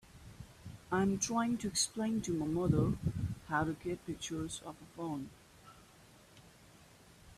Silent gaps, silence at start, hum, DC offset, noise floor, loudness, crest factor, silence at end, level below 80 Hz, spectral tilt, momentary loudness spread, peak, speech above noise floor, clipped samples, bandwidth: none; 0.15 s; none; under 0.1%; -61 dBFS; -36 LUFS; 20 dB; 0.05 s; -58 dBFS; -4.5 dB/octave; 19 LU; -18 dBFS; 25 dB; under 0.1%; 14.5 kHz